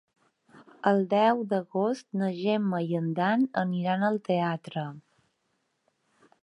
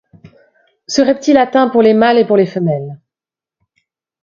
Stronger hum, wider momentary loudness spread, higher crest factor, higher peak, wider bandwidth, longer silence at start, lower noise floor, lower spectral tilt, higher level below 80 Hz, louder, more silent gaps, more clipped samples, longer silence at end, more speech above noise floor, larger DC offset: neither; about the same, 7 LU vs 9 LU; first, 20 dB vs 14 dB; second, -8 dBFS vs 0 dBFS; first, 10.5 kHz vs 7.4 kHz; second, 0.55 s vs 0.9 s; second, -76 dBFS vs -89 dBFS; first, -7.5 dB/octave vs -5.5 dB/octave; second, -80 dBFS vs -56 dBFS; second, -27 LUFS vs -12 LUFS; neither; neither; first, 1.45 s vs 1.25 s; second, 49 dB vs 78 dB; neither